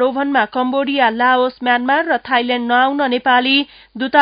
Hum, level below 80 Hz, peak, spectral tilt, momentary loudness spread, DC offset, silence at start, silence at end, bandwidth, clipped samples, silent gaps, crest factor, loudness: none; -58 dBFS; 0 dBFS; -7 dB/octave; 4 LU; under 0.1%; 0 s; 0 s; 5.2 kHz; under 0.1%; none; 16 dB; -15 LUFS